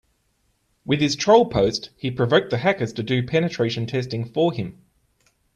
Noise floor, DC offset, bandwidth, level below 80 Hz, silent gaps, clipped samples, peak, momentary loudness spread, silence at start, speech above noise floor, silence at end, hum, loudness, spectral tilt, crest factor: -68 dBFS; under 0.1%; 10 kHz; -52 dBFS; none; under 0.1%; -2 dBFS; 11 LU; 0.85 s; 47 dB; 0.85 s; none; -21 LUFS; -5.5 dB/octave; 20 dB